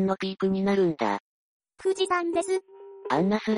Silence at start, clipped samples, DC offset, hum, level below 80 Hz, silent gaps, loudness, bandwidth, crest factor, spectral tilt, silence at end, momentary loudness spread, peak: 0 s; under 0.1%; under 0.1%; none; -66 dBFS; 1.20-1.60 s; -27 LUFS; 10.5 kHz; 16 dB; -6 dB/octave; 0 s; 7 LU; -12 dBFS